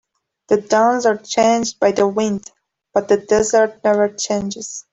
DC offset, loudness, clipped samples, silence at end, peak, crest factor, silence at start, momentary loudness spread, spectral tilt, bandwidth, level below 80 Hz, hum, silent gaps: under 0.1%; -17 LUFS; under 0.1%; 0.1 s; -2 dBFS; 14 dB; 0.5 s; 8 LU; -4 dB/octave; 8.2 kHz; -56 dBFS; none; none